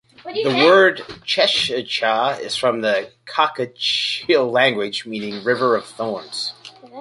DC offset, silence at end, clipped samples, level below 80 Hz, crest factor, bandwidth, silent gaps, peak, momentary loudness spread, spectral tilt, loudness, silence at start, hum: under 0.1%; 0 s; under 0.1%; -64 dBFS; 18 dB; 11.5 kHz; none; -2 dBFS; 12 LU; -3.5 dB/octave; -19 LUFS; 0.25 s; none